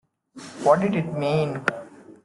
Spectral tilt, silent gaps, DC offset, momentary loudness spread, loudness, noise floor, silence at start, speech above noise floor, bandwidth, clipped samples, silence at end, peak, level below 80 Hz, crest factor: -6.5 dB/octave; none; under 0.1%; 20 LU; -23 LUFS; -44 dBFS; 0.35 s; 23 dB; 11.5 kHz; under 0.1%; 0.15 s; -4 dBFS; -62 dBFS; 20 dB